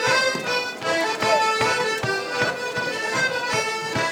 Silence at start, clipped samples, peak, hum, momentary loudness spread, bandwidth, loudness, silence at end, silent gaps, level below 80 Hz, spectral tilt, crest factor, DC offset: 0 s; under 0.1%; -6 dBFS; none; 5 LU; 19.5 kHz; -22 LUFS; 0 s; none; -60 dBFS; -2.5 dB/octave; 16 dB; under 0.1%